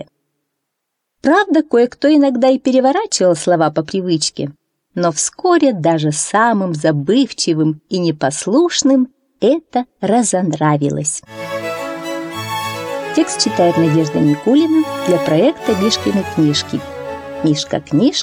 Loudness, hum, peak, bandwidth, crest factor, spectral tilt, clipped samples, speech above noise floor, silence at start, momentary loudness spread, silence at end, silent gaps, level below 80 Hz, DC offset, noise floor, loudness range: -15 LUFS; none; -2 dBFS; 16 kHz; 14 dB; -4.5 dB/octave; under 0.1%; 61 dB; 0 s; 10 LU; 0 s; none; -56 dBFS; under 0.1%; -75 dBFS; 4 LU